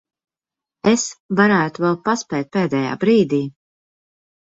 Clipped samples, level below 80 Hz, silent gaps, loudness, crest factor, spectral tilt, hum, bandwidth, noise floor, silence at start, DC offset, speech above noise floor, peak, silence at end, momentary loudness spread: under 0.1%; -60 dBFS; 1.20-1.29 s; -18 LUFS; 18 dB; -5 dB/octave; none; 8 kHz; -89 dBFS; 0.85 s; under 0.1%; 71 dB; -2 dBFS; 0.9 s; 7 LU